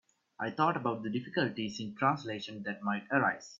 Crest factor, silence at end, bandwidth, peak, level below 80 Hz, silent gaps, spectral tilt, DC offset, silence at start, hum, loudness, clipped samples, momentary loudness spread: 22 dB; 0.05 s; 7.8 kHz; -12 dBFS; -74 dBFS; none; -5.5 dB/octave; under 0.1%; 0.4 s; none; -33 LUFS; under 0.1%; 9 LU